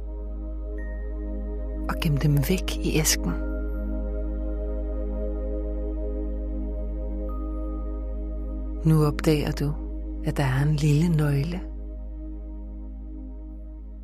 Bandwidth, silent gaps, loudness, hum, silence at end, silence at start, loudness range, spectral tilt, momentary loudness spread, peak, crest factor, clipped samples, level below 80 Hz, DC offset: 15.5 kHz; none; -27 LUFS; none; 0 s; 0 s; 7 LU; -5.5 dB/octave; 16 LU; -8 dBFS; 18 dB; under 0.1%; -30 dBFS; under 0.1%